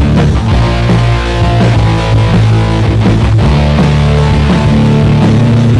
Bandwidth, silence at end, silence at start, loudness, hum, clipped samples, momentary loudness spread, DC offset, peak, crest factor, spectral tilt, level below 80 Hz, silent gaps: 10.5 kHz; 0 s; 0 s; -9 LUFS; none; under 0.1%; 2 LU; under 0.1%; -2 dBFS; 6 dB; -7.5 dB/octave; -16 dBFS; none